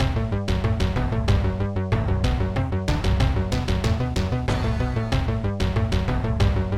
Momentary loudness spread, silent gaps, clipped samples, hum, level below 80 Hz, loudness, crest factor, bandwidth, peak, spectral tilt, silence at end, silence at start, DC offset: 3 LU; none; under 0.1%; none; -28 dBFS; -24 LUFS; 14 dB; 12.5 kHz; -8 dBFS; -7 dB/octave; 0 s; 0 s; 0.3%